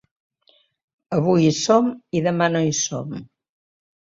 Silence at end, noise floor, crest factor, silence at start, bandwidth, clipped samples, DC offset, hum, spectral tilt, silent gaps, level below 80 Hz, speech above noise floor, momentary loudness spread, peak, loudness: 0.9 s; -61 dBFS; 20 dB; 1.1 s; 7.8 kHz; under 0.1%; under 0.1%; none; -5 dB/octave; none; -60 dBFS; 41 dB; 12 LU; -4 dBFS; -20 LUFS